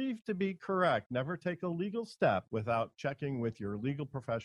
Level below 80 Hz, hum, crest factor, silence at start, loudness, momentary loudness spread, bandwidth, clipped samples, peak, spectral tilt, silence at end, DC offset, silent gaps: -70 dBFS; none; 18 dB; 0 s; -35 LUFS; 7 LU; 11.5 kHz; under 0.1%; -16 dBFS; -7.5 dB/octave; 0 s; under 0.1%; 1.06-1.10 s